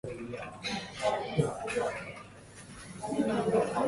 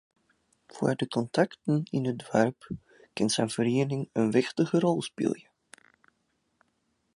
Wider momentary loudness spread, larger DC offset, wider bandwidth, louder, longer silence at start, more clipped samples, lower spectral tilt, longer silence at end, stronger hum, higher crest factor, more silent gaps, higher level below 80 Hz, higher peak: first, 18 LU vs 7 LU; neither; about the same, 11.5 kHz vs 11.5 kHz; second, -33 LUFS vs -28 LUFS; second, 0.05 s vs 0.75 s; neither; about the same, -5.5 dB/octave vs -5.5 dB/octave; second, 0 s vs 1.75 s; neither; about the same, 18 dB vs 22 dB; neither; first, -60 dBFS vs -66 dBFS; second, -14 dBFS vs -8 dBFS